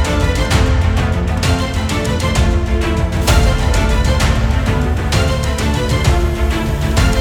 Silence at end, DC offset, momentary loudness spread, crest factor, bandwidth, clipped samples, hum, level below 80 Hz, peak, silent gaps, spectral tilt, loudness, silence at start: 0 s; under 0.1%; 3 LU; 14 dB; 17.5 kHz; under 0.1%; none; -16 dBFS; 0 dBFS; none; -5.5 dB/octave; -15 LUFS; 0 s